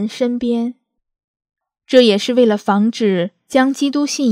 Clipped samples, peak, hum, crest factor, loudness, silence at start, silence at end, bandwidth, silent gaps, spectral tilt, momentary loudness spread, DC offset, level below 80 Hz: under 0.1%; 0 dBFS; none; 16 dB; -16 LUFS; 0 s; 0 s; 14.5 kHz; 1.24-1.34 s; -5 dB/octave; 8 LU; under 0.1%; -62 dBFS